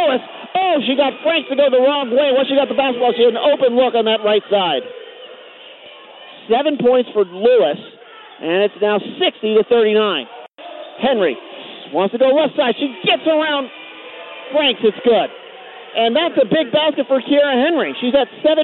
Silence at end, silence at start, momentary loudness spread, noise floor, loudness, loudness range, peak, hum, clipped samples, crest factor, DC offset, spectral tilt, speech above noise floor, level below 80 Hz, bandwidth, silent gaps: 0 s; 0 s; 19 LU; -39 dBFS; -16 LUFS; 4 LU; -4 dBFS; none; under 0.1%; 14 dB; under 0.1%; -9 dB/octave; 24 dB; -62 dBFS; 4.3 kHz; none